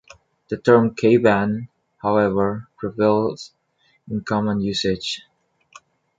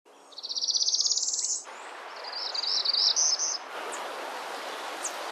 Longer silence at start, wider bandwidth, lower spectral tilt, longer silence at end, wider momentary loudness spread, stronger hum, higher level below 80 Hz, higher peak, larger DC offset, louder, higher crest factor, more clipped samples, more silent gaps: first, 0.5 s vs 0.05 s; second, 9 kHz vs 13 kHz; first, -6 dB/octave vs 3.5 dB/octave; first, 1 s vs 0 s; about the same, 15 LU vs 17 LU; neither; first, -52 dBFS vs under -90 dBFS; first, -2 dBFS vs -12 dBFS; neither; first, -20 LUFS vs -27 LUFS; about the same, 18 dB vs 20 dB; neither; neither